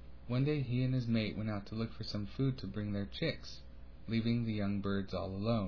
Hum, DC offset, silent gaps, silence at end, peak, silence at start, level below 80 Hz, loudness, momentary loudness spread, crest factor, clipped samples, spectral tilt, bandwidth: none; 0.3%; none; 0 s; -22 dBFS; 0 s; -54 dBFS; -37 LUFS; 8 LU; 14 dB; under 0.1%; -6.5 dB/octave; 5.4 kHz